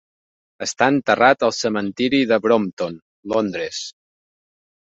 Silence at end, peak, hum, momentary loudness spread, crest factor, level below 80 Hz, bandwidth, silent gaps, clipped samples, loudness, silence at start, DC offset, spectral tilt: 1.05 s; -2 dBFS; none; 13 LU; 20 dB; -60 dBFS; 8.2 kHz; 2.73-2.77 s, 3.02-3.23 s; under 0.1%; -19 LUFS; 0.6 s; under 0.1%; -4 dB/octave